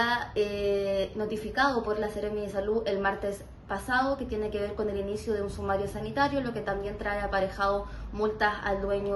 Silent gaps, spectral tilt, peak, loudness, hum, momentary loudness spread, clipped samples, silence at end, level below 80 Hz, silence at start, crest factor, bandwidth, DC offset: none; -5.5 dB/octave; -12 dBFS; -30 LUFS; none; 6 LU; under 0.1%; 0 s; -46 dBFS; 0 s; 18 dB; 12.5 kHz; under 0.1%